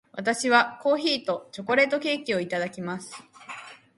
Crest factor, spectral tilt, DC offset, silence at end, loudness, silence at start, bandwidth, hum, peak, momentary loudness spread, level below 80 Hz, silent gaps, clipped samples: 22 dB; -3.5 dB/octave; under 0.1%; 0.2 s; -25 LUFS; 0.15 s; 11.5 kHz; none; -4 dBFS; 20 LU; -74 dBFS; none; under 0.1%